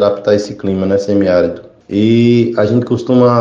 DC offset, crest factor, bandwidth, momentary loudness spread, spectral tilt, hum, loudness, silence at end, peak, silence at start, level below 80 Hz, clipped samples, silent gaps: under 0.1%; 12 dB; 7.6 kHz; 9 LU; -7.5 dB/octave; none; -13 LUFS; 0 s; 0 dBFS; 0 s; -50 dBFS; under 0.1%; none